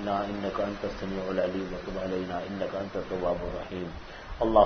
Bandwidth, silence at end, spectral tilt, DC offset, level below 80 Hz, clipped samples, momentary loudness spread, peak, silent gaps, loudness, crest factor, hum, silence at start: 6.6 kHz; 0 s; -7 dB/octave; under 0.1%; -46 dBFS; under 0.1%; 7 LU; -8 dBFS; none; -32 LUFS; 22 dB; none; 0 s